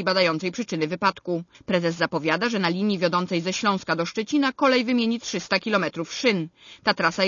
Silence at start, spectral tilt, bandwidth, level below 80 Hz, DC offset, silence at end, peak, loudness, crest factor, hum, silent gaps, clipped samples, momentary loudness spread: 0 s; -4.5 dB/octave; 7.4 kHz; -66 dBFS; under 0.1%; 0 s; -4 dBFS; -24 LUFS; 18 dB; none; none; under 0.1%; 7 LU